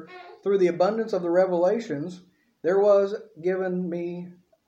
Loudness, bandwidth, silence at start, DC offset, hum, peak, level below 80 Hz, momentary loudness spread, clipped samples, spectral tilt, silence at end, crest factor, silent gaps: -24 LUFS; 8 kHz; 0 s; under 0.1%; none; -10 dBFS; -78 dBFS; 14 LU; under 0.1%; -7.5 dB/octave; 0.35 s; 16 dB; none